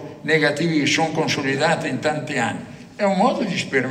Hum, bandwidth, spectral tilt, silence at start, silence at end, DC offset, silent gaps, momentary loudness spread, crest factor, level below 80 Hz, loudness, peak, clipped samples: none; 15 kHz; -4.5 dB/octave; 0 s; 0 s; under 0.1%; none; 5 LU; 18 dB; -60 dBFS; -20 LUFS; -4 dBFS; under 0.1%